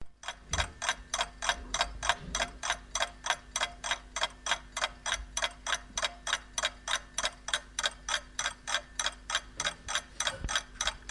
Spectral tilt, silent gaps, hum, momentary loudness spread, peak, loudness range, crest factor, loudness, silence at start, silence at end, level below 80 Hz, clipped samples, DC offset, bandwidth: 0 dB/octave; none; none; 3 LU; -10 dBFS; 1 LU; 26 dB; -33 LUFS; 0 s; 0 s; -48 dBFS; under 0.1%; under 0.1%; 11.5 kHz